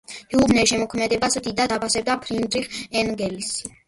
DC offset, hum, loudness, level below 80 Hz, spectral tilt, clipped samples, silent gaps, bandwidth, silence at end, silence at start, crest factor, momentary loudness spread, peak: under 0.1%; none; -22 LUFS; -48 dBFS; -3 dB/octave; under 0.1%; none; 11.5 kHz; 0.2 s; 0.1 s; 18 dB; 8 LU; -4 dBFS